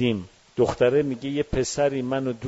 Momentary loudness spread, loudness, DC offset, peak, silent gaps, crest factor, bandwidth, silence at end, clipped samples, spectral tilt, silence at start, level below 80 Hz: 7 LU; -24 LUFS; under 0.1%; -8 dBFS; none; 16 dB; 8 kHz; 0 s; under 0.1%; -5.5 dB/octave; 0 s; -44 dBFS